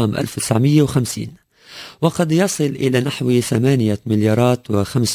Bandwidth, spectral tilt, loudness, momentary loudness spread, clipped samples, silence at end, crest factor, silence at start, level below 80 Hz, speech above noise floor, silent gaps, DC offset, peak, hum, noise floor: 16 kHz; -6 dB/octave; -17 LUFS; 8 LU; under 0.1%; 0 s; 14 dB; 0 s; -46 dBFS; 22 dB; none; under 0.1%; -2 dBFS; none; -39 dBFS